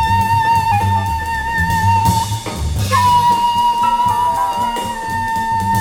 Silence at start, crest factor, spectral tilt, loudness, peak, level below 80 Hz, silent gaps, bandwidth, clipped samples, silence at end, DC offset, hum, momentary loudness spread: 0 s; 12 dB; -4.5 dB/octave; -15 LUFS; -2 dBFS; -30 dBFS; none; 17.5 kHz; under 0.1%; 0 s; under 0.1%; none; 8 LU